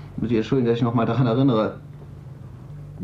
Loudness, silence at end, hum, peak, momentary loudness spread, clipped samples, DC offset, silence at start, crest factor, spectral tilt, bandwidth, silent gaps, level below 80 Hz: -21 LUFS; 0 s; none; -8 dBFS; 21 LU; under 0.1%; under 0.1%; 0 s; 14 dB; -9 dB/octave; 7.2 kHz; none; -50 dBFS